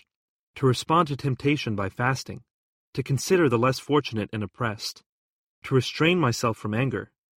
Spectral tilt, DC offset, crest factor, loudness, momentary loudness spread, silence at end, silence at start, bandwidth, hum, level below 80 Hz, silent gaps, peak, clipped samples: -5.5 dB/octave; under 0.1%; 18 dB; -25 LUFS; 13 LU; 0.35 s; 0.55 s; 16 kHz; none; -58 dBFS; 2.50-2.93 s, 5.06-5.62 s; -8 dBFS; under 0.1%